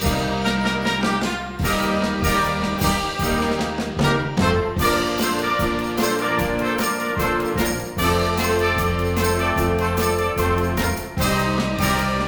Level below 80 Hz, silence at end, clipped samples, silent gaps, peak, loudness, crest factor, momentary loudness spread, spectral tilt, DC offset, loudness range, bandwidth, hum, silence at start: -34 dBFS; 0 s; under 0.1%; none; -6 dBFS; -21 LUFS; 16 dB; 3 LU; -4.5 dB/octave; under 0.1%; 1 LU; over 20 kHz; none; 0 s